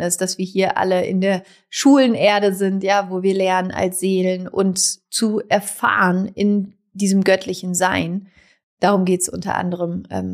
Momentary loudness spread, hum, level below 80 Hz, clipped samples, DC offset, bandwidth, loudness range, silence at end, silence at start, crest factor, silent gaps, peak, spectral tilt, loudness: 8 LU; none; -58 dBFS; under 0.1%; under 0.1%; 15.5 kHz; 2 LU; 0 s; 0 s; 14 dB; 8.63-8.77 s; -4 dBFS; -4.5 dB/octave; -18 LUFS